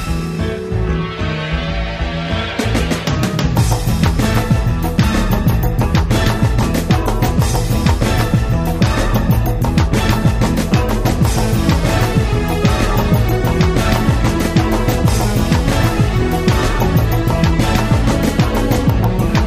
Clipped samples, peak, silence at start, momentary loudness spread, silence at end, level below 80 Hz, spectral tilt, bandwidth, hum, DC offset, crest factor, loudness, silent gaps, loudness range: under 0.1%; 0 dBFS; 0 s; 5 LU; 0 s; -20 dBFS; -6 dB/octave; 16 kHz; none; under 0.1%; 14 dB; -15 LUFS; none; 2 LU